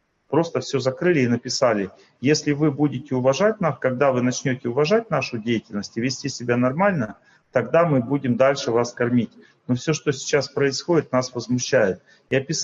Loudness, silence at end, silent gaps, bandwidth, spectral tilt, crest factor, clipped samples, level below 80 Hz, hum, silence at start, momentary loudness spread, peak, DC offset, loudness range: -22 LUFS; 0 s; none; 7.8 kHz; -5 dB/octave; 18 dB; under 0.1%; -62 dBFS; none; 0.3 s; 7 LU; -4 dBFS; under 0.1%; 2 LU